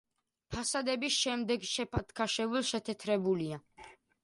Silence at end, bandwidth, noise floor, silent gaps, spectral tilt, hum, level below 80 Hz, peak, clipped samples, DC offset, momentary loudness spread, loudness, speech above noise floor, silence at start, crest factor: 0.3 s; 11.5 kHz; -57 dBFS; none; -3.5 dB/octave; none; -56 dBFS; -18 dBFS; under 0.1%; under 0.1%; 7 LU; -33 LUFS; 23 dB; 0.5 s; 16 dB